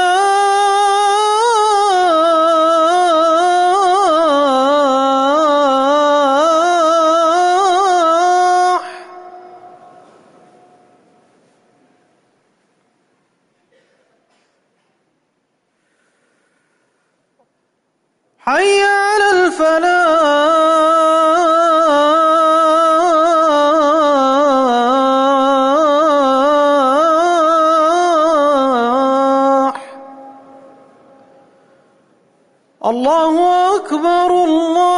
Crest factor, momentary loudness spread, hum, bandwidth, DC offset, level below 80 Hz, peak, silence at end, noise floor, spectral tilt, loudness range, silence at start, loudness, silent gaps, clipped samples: 10 dB; 3 LU; none; 11 kHz; under 0.1%; -58 dBFS; -4 dBFS; 0 s; -66 dBFS; -2 dB/octave; 8 LU; 0 s; -12 LUFS; none; under 0.1%